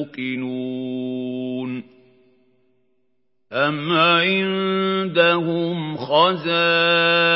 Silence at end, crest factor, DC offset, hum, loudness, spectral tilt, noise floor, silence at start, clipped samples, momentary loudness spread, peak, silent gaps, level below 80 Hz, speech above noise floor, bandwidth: 0 s; 20 dB; under 0.1%; none; -19 LUFS; -10 dB/octave; -73 dBFS; 0 s; under 0.1%; 12 LU; -2 dBFS; none; -74 dBFS; 54 dB; 5.8 kHz